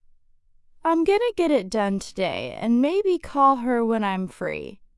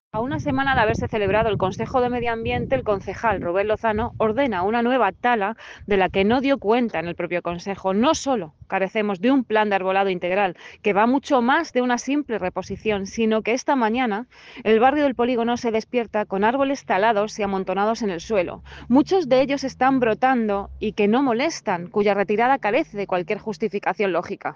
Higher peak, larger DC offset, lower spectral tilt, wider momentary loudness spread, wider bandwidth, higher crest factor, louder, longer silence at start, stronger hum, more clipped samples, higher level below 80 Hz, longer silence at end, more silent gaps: about the same, -8 dBFS vs -6 dBFS; neither; about the same, -6 dB/octave vs -5.5 dB/octave; about the same, 9 LU vs 7 LU; first, 12 kHz vs 7.6 kHz; about the same, 16 dB vs 16 dB; about the same, -23 LUFS vs -22 LUFS; first, 0.85 s vs 0.15 s; neither; neither; second, -54 dBFS vs -48 dBFS; first, 0.2 s vs 0 s; neither